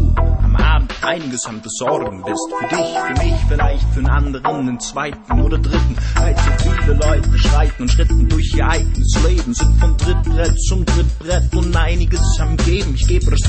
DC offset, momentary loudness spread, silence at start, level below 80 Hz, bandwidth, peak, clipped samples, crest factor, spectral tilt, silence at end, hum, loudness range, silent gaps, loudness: under 0.1%; 6 LU; 0 s; -16 dBFS; 8.8 kHz; -2 dBFS; under 0.1%; 12 dB; -5.5 dB/octave; 0 s; none; 3 LU; none; -17 LUFS